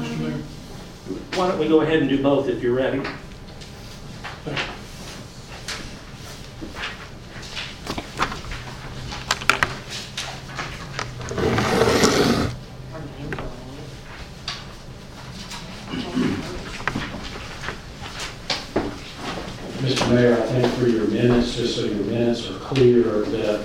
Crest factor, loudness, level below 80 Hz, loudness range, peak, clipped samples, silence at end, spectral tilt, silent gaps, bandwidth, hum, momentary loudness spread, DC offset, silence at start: 24 dB; -23 LUFS; -40 dBFS; 12 LU; 0 dBFS; under 0.1%; 0 s; -5 dB/octave; none; 16.5 kHz; none; 19 LU; under 0.1%; 0 s